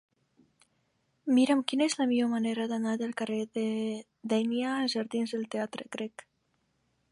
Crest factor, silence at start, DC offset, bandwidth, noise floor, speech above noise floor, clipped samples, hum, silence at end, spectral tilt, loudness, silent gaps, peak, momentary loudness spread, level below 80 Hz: 20 dB; 1.25 s; under 0.1%; 11.5 kHz; -75 dBFS; 45 dB; under 0.1%; none; 1.05 s; -4.5 dB/octave; -30 LUFS; none; -10 dBFS; 11 LU; -82 dBFS